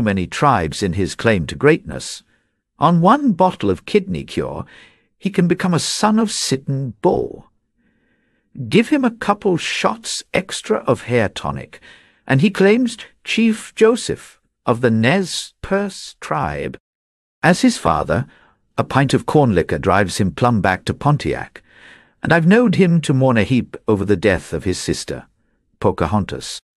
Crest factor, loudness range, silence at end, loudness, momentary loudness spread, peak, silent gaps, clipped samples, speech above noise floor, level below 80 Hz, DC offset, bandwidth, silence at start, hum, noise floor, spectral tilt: 16 dB; 4 LU; 0.2 s; -17 LUFS; 13 LU; -2 dBFS; 16.80-17.42 s; under 0.1%; 47 dB; -44 dBFS; under 0.1%; 13 kHz; 0 s; none; -64 dBFS; -5.5 dB/octave